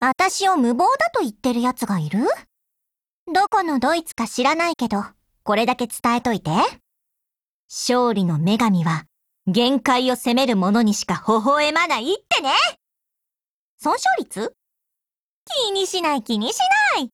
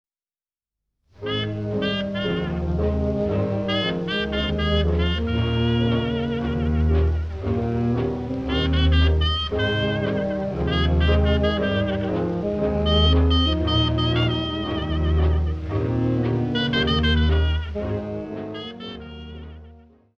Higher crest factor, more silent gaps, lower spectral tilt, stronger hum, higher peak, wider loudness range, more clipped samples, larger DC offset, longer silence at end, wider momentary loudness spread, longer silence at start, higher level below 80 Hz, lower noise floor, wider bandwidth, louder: about the same, 16 dB vs 16 dB; first, 3.09-3.26 s, 7.41-7.69 s, 13.47-13.78 s, 15.18-15.46 s vs none; second, -4 dB/octave vs -7.5 dB/octave; neither; about the same, -6 dBFS vs -6 dBFS; about the same, 4 LU vs 4 LU; neither; neither; second, 0.05 s vs 0.4 s; about the same, 7 LU vs 8 LU; second, 0 s vs 1.2 s; second, -60 dBFS vs -28 dBFS; about the same, under -90 dBFS vs under -90 dBFS; first, 16.5 kHz vs 6.4 kHz; about the same, -20 LUFS vs -22 LUFS